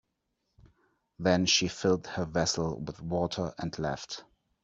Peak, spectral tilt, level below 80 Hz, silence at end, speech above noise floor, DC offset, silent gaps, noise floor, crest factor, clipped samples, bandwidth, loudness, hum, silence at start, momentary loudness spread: -10 dBFS; -4 dB/octave; -58 dBFS; 0.4 s; 50 dB; under 0.1%; none; -80 dBFS; 22 dB; under 0.1%; 8 kHz; -30 LUFS; none; 0.65 s; 13 LU